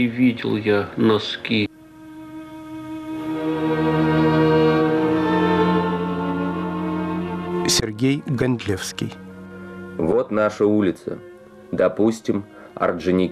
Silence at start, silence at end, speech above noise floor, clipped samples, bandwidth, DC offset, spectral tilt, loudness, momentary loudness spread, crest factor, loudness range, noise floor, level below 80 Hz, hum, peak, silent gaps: 0 s; 0 s; 22 dB; under 0.1%; 15 kHz; under 0.1%; -5.5 dB/octave; -21 LUFS; 18 LU; 14 dB; 5 LU; -42 dBFS; -48 dBFS; none; -8 dBFS; none